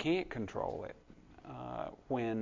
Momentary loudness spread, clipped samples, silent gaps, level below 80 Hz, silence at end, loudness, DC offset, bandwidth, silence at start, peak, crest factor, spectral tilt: 20 LU; under 0.1%; none; -60 dBFS; 0 s; -40 LUFS; under 0.1%; 7.6 kHz; 0 s; -22 dBFS; 16 dB; -7 dB/octave